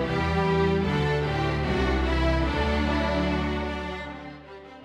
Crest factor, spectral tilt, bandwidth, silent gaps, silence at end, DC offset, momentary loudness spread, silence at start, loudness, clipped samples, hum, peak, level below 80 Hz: 14 dB; -7 dB/octave; 10 kHz; none; 0 s; under 0.1%; 13 LU; 0 s; -25 LUFS; under 0.1%; none; -12 dBFS; -32 dBFS